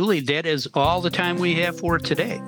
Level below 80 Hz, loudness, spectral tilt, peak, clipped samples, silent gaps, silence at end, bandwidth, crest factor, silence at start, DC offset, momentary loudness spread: -46 dBFS; -22 LUFS; -5.5 dB/octave; -2 dBFS; under 0.1%; none; 0 s; over 20 kHz; 20 dB; 0 s; under 0.1%; 3 LU